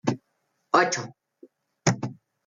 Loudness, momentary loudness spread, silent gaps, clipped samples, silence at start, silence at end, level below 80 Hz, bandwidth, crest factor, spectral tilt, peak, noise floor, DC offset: -25 LUFS; 16 LU; none; under 0.1%; 0.05 s; 0.35 s; -64 dBFS; 9.6 kHz; 20 dB; -4.5 dB/octave; -8 dBFS; -74 dBFS; under 0.1%